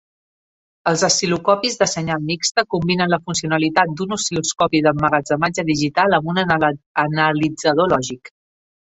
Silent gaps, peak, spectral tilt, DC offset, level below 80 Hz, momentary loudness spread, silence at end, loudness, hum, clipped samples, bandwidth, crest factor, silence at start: 6.86-6.95 s; 0 dBFS; -4 dB/octave; under 0.1%; -52 dBFS; 5 LU; 0.55 s; -18 LUFS; none; under 0.1%; 8.4 kHz; 18 dB; 0.85 s